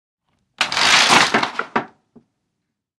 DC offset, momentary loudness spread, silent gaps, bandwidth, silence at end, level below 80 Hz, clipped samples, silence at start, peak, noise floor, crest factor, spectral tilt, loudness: under 0.1%; 14 LU; none; 15.5 kHz; 1.1 s; -56 dBFS; under 0.1%; 0.6 s; 0 dBFS; -77 dBFS; 20 dB; -1 dB/octave; -15 LUFS